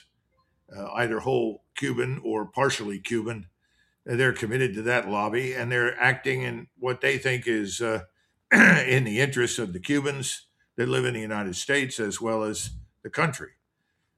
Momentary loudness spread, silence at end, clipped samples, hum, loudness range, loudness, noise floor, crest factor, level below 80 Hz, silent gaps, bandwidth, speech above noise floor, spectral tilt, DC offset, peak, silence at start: 11 LU; 0.7 s; under 0.1%; none; 6 LU; -25 LUFS; -76 dBFS; 22 dB; -58 dBFS; none; 14 kHz; 50 dB; -4.5 dB/octave; under 0.1%; -4 dBFS; 0.7 s